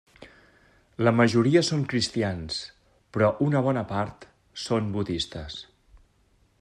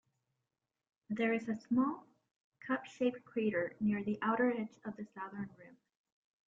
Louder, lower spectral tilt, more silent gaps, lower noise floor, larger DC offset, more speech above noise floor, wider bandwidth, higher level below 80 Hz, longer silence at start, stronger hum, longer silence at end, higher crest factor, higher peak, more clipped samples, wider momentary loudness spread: first, -25 LUFS vs -37 LUFS; second, -5.5 dB/octave vs -7.5 dB/octave; second, none vs 2.36-2.52 s; second, -64 dBFS vs -90 dBFS; neither; second, 39 dB vs 53 dB; first, 10.5 kHz vs 7.6 kHz; first, -56 dBFS vs -78 dBFS; second, 0.2 s vs 1.1 s; neither; first, 0.95 s vs 0.8 s; about the same, 20 dB vs 18 dB; first, -8 dBFS vs -20 dBFS; neither; first, 17 LU vs 13 LU